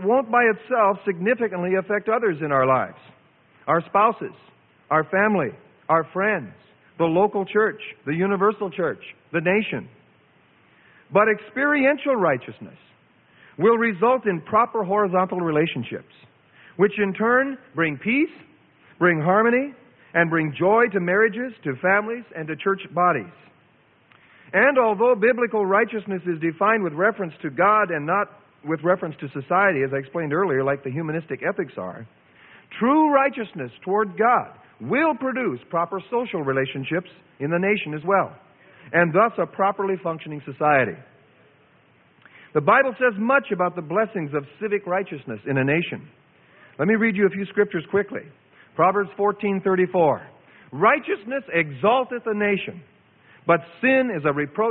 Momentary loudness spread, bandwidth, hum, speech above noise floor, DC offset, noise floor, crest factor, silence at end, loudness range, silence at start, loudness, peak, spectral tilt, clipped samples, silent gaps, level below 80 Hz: 12 LU; 4.1 kHz; none; 37 dB; under 0.1%; -58 dBFS; 18 dB; 0 s; 3 LU; 0 s; -22 LUFS; -4 dBFS; -11 dB/octave; under 0.1%; none; -66 dBFS